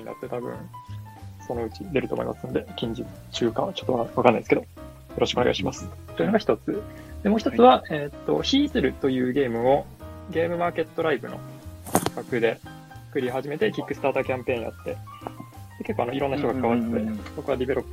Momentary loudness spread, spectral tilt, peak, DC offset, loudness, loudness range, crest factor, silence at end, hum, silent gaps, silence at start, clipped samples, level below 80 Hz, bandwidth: 17 LU; -5.5 dB/octave; 0 dBFS; under 0.1%; -25 LUFS; 7 LU; 26 dB; 0 s; none; none; 0 s; under 0.1%; -48 dBFS; 16 kHz